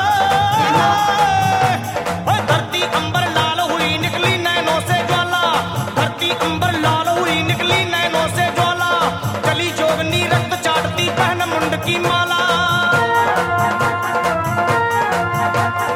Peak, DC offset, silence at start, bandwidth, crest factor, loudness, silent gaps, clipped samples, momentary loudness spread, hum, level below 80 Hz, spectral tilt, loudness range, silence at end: -4 dBFS; under 0.1%; 0 s; 17 kHz; 12 dB; -16 LUFS; none; under 0.1%; 3 LU; none; -46 dBFS; -4 dB/octave; 1 LU; 0 s